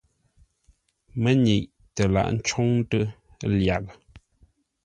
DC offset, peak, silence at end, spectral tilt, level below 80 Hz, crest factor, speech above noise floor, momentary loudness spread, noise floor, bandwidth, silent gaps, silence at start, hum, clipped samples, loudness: under 0.1%; -8 dBFS; 0.65 s; -6 dB/octave; -44 dBFS; 18 dB; 41 dB; 12 LU; -63 dBFS; 10 kHz; none; 1.15 s; none; under 0.1%; -24 LUFS